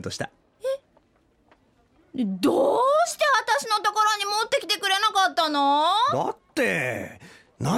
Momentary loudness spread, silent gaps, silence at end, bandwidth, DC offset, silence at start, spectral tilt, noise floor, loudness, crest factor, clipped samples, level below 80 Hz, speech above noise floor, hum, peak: 14 LU; none; 0 s; 16.5 kHz; under 0.1%; 0 s; -3.5 dB/octave; -63 dBFS; -23 LUFS; 14 dB; under 0.1%; -64 dBFS; 41 dB; none; -10 dBFS